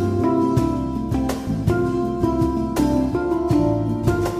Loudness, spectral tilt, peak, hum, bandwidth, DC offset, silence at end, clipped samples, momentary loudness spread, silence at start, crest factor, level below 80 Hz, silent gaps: -21 LUFS; -8 dB/octave; -4 dBFS; none; 15.5 kHz; under 0.1%; 0 s; under 0.1%; 4 LU; 0 s; 16 dB; -34 dBFS; none